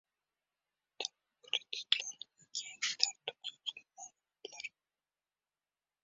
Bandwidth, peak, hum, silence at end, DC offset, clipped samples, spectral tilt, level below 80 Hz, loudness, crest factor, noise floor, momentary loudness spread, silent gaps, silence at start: 7.6 kHz; -10 dBFS; 50 Hz at -95 dBFS; 1.35 s; under 0.1%; under 0.1%; 4.5 dB/octave; under -90 dBFS; -38 LUFS; 34 dB; under -90 dBFS; 18 LU; none; 1 s